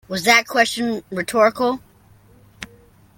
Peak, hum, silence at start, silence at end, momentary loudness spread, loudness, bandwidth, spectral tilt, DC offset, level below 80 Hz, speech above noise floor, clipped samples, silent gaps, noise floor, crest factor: 0 dBFS; none; 0.1 s; 0.55 s; 23 LU; -18 LUFS; 17 kHz; -3 dB/octave; under 0.1%; -58 dBFS; 33 dB; under 0.1%; none; -51 dBFS; 20 dB